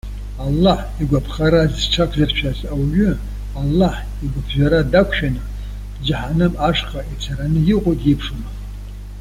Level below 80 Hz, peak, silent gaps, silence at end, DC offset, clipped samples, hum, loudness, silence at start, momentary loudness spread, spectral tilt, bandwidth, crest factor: -26 dBFS; -2 dBFS; none; 0 s; under 0.1%; under 0.1%; 50 Hz at -25 dBFS; -18 LUFS; 0.05 s; 15 LU; -6.5 dB/octave; 15.5 kHz; 16 dB